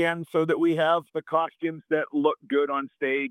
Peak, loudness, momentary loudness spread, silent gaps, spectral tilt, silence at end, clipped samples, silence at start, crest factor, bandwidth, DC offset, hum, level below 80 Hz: -8 dBFS; -26 LUFS; 5 LU; none; -6.5 dB/octave; 0 s; under 0.1%; 0 s; 18 dB; 12.5 kHz; under 0.1%; none; -80 dBFS